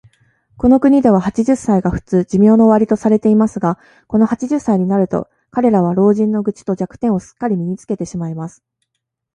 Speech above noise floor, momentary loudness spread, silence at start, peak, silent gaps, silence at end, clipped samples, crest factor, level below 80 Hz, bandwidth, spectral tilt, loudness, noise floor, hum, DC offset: 62 dB; 12 LU; 0.6 s; 0 dBFS; none; 0.85 s; under 0.1%; 14 dB; -44 dBFS; 9.6 kHz; -8.5 dB/octave; -15 LUFS; -76 dBFS; none; under 0.1%